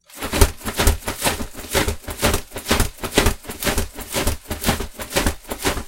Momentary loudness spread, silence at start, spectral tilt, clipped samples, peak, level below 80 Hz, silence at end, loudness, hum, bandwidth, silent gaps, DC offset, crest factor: 6 LU; 0.1 s; -3.5 dB/octave; under 0.1%; 0 dBFS; -26 dBFS; 0 s; -22 LUFS; none; 17 kHz; none; under 0.1%; 22 dB